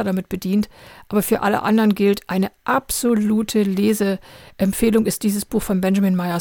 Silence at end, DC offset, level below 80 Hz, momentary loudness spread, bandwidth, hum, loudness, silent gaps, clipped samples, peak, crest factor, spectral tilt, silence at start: 0 s; under 0.1%; -44 dBFS; 6 LU; 17.5 kHz; none; -19 LUFS; none; under 0.1%; -4 dBFS; 16 dB; -5.5 dB/octave; 0 s